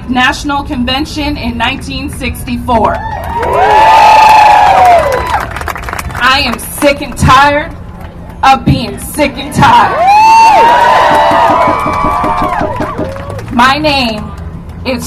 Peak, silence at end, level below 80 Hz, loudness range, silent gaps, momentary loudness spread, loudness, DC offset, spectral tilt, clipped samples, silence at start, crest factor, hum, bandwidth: 0 dBFS; 0 s; -26 dBFS; 6 LU; none; 15 LU; -8 LUFS; under 0.1%; -4.5 dB/octave; 2%; 0 s; 8 dB; none; 16 kHz